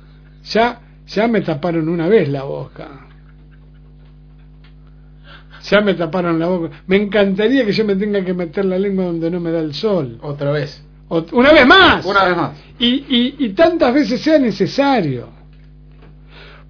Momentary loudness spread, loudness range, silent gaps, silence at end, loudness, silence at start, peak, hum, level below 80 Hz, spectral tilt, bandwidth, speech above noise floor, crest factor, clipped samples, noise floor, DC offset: 13 LU; 9 LU; none; 0.15 s; -15 LUFS; 0.45 s; 0 dBFS; 50 Hz at -40 dBFS; -42 dBFS; -6.5 dB/octave; 5.4 kHz; 26 dB; 16 dB; under 0.1%; -41 dBFS; under 0.1%